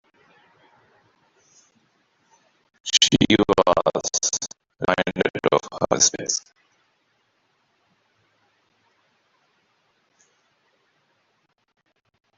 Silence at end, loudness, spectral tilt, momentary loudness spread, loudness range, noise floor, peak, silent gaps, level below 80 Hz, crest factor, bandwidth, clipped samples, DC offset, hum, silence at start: 6 s; -20 LUFS; -2.5 dB/octave; 11 LU; 6 LU; -69 dBFS; -2 dBFS; none; -54 dBFS; 26 dB; 8.2 kHz; under 0.1%; under 0.1%; none; 2.85 s